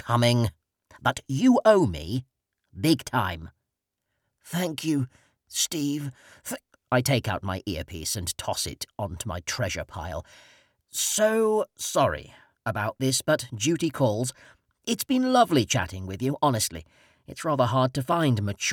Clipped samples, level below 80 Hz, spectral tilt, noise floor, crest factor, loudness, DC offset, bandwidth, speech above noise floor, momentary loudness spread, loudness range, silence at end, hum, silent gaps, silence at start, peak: under 0.1%; -52 dBFS; -4.5 dB/octave; -83 dBFS; 20 dB; -26 LUFS; under 0.1%; 19 kHz; 57 dB; 13 LU; 6 LU; 0 s; none; none; 0.05 s; -6 dBFS